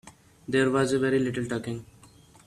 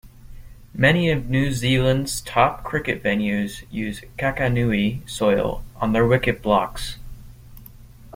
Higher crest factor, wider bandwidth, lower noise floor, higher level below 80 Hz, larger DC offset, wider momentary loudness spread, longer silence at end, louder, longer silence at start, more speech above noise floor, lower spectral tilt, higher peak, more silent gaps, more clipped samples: about the same, 18 dB vs 20 dB; second, 13 kHz vs 16.5 kHz; first, -54 dBFS vs -43 dBFS; second, -60 dBFS vs -38 dBFS; neither; first, 14 LU vs 11 LU; first, 0.6 s vs 0 s; second, -26 LUFS vs -21 LUFS; about the same, 0.05 s vs 0.05 s; first, 29 dB vs 22 dB; about the same, -5.5 dB/octave vs -5.5 dB/octave; second, -10 dBFS vs -2 dBFS; neither; neither